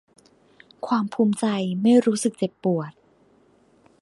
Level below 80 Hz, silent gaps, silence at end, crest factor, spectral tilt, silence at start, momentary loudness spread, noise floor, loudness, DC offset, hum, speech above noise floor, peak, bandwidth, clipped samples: -70 dBFS; none; 1.1 s; 18 dB; -6 dB/octave; 0.85 s; 10 LU; -59 dBFS; -22 LUFS; under 0.1%; none; 37 dB; -6 dBFS; 11.5 kHz; under 0.1%